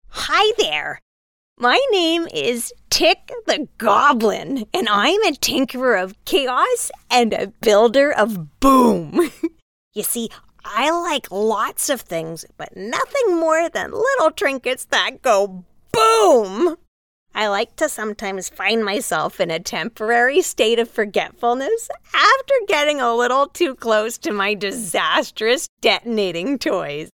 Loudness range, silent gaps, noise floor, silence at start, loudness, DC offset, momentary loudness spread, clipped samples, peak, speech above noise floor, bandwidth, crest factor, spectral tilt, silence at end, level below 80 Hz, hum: 4 LU; 1.02-1.56 s, 9.62-9.91 s, 16.87-17.26 s, 25.69-25.77 s; under -90 dBFS; 0.1 s; -18 LUFS; under 0.1%; 10 LU; under 0.1%; -2 dBFS; over 72 dB; 18 kHz; 16 dB; -2.5 dB/octave; 0.1 s; -50 dBFS; none